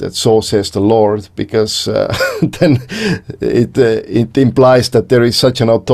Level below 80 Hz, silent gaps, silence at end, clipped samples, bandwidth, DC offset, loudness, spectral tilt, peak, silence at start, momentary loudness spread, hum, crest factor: -42 dBFS; none; 0 s; under 0.1%; 14.5 kHz; under 0.1%; -12 LUFS; -5.5 dB/octave; 0 dBFS; 0 s; 7 LU; none; 12 dB